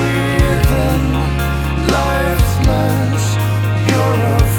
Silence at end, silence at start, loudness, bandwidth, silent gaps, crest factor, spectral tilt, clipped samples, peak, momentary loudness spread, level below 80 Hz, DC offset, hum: 0 s; 0 s; -15 LUFS; over 20 kHz; none; 14 dB; -6 dB/octave; under 0.1%; 0 dBFS; 3 LU; -20 dBFS; under 0.1%; none